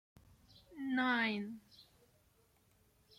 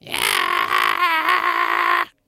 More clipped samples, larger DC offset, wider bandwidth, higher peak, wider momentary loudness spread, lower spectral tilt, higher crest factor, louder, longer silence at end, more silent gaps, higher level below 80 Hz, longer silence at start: neither; neither; about the same, 15 kHz vs 16.5 kHz; second, -24 dBFS vs 0 dBFS; first, 20 LU vs 2 LU; first, -5.5 dB/octave vs -0.5 dB/octave; about the same, 18 dB vs 20 dB; second, -37 LUFS vs -18 LUFS; first, 1.35 s vs 0.2 s; neither; second, -76 dBFS vs -60 dBFS; first, 0.7 s vs 0.05 s